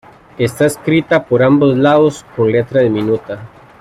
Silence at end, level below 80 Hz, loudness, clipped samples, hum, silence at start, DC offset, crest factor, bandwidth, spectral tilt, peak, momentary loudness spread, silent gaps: 0.35 s; -50 dBFS; -13 LUFS; under 0.1%; none; 0.4 s; under 0.1%; 12 dB; 15 kHz; -6.5 dB/octave; 0 dBFS; 9 LU; none